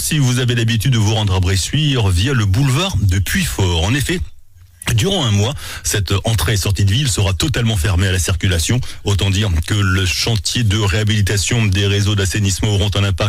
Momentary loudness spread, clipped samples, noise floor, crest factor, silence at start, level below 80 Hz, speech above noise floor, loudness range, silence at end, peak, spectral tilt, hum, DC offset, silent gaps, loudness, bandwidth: 3 LU; under 0.1%; -39 dBFS; 10 dB; 0 s; -28 dBFS; 24 dB; 2 LU; 0 s; -6 dBFS; -4.5 dB/octave; none; under 0.1%; none; -16 LUFS; 16 kHz